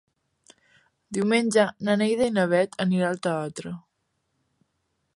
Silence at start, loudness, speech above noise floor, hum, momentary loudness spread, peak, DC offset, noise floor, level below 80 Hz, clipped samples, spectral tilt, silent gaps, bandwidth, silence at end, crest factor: 1.1 s; -24 LUFS; 52 dB; none; 13 LU; -8 dBFS; under 0.1%; -75 dBFS; -66 dBFS; under 0.1%; -5.5 dB/octave; none; 11.5 kHz; 1.4 s; 18 dB